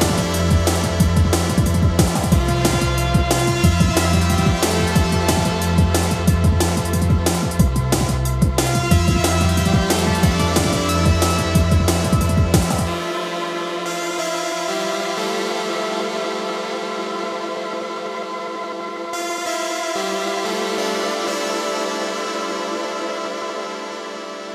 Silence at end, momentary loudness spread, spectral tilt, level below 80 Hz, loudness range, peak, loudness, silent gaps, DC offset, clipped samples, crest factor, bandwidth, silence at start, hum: 0 s; 9 LU; -5 dB/octave; -28 dBFS; 7 LU; 0 dBFS; -19 LUFS; none; under 0.1%; under 0.1%; 18 dB; 15.5 kHz; 0 s; none